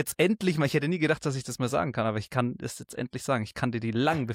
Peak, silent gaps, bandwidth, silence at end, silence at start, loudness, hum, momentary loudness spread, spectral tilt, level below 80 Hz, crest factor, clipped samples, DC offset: -12 dBFS; none; 16.5 kHz; 0 s; 0 s; -28 LUFS; none; 9 LU; -5.5 dB/octave; -60 dBFS; 16 dB; under 0.1%; under 0.1%